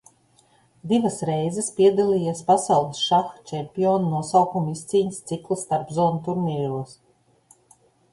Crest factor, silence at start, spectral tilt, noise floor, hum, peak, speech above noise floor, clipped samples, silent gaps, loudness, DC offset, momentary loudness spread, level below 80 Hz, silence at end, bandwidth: 18 dB; 0.85 s; -6 dB/octave; -60 dBFS; none; -4 dBFS; 38 dB; under 0.1%; none; -23 LUFS; under 0.1%; 12 LU; -62 dBFS; 1.2 s; 11.5 kHz